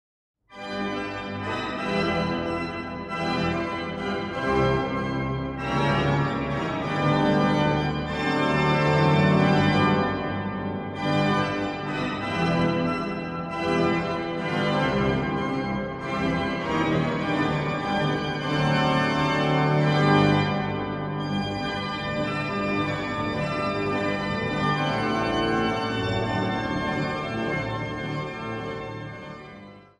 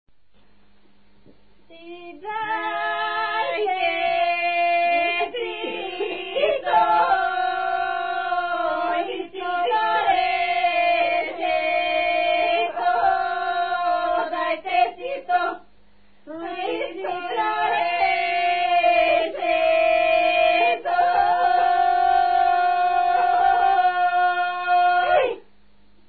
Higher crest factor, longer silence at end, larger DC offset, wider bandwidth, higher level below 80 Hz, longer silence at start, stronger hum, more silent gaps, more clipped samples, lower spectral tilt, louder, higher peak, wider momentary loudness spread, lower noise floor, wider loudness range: about the same, 18 dB vs 14 dB; second, 0.2 s vs 0.7 s; second, under 0.1% vs 0.4%; first, 10 kHz vs 4.8 kHz; first, -46 dBFS vs -58 dBFS; second, 0.5 s vs 1.7 s; neither; neither; neither; about the same, -6.5 dB/octave vs -7 dB/octave; second, -25 LUFS vs -21 LUFS; about the same, -8 dBFS vs -8 dBFS; about the same, 9 LU vs 10 LU; second, -45 dBFS vs -62 dBFS; about the same, 5 LU vs 6 LU